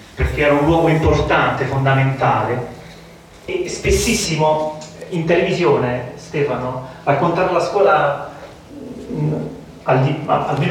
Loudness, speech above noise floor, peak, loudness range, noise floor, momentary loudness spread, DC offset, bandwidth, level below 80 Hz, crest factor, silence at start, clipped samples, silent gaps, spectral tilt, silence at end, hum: -17 LUFS; 24 dB; -2 dBFS; 2 LU; -41 dBFS; 16 LU; under 0.1%; 17 kHz; -34 dBFS; 16 dB; 0 s; under 0.1%; none; -5.5 dB/octave; 0 s; none